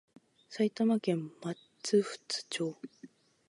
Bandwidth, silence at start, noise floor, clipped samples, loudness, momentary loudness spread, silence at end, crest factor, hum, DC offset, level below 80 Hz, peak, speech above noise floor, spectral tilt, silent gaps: 11.5 kHz; 0.5 s; -57 dBFS; under 0.1%; -33 LUFS; 15 LU; 0.4 s; 18 dB; none; under 0.1%; -86 dBFS; -16 dBFS; 25 dB; -5 dB/octave; none